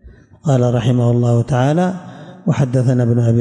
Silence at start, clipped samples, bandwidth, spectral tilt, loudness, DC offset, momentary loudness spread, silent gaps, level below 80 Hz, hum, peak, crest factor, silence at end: 0.05 s; under 0.1%; 9.4 kHz; -8 dB/octave; -16 LUFS; under 0.1%; 10 LU; none; -46 dBFS; none; -6 dBFS; 10 dB; 0 s